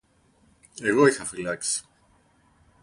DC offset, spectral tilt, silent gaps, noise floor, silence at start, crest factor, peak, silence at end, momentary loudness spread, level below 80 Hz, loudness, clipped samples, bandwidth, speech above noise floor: under 0.1%; -3.5 dB/octave; none; -62 dBFS; 0.75 s; 22 dB; -6 dBFS; 1 s; 11 LU; -62 dBFS; -24 LUFS; under 0.1%; 11.5 kHz; 39 dB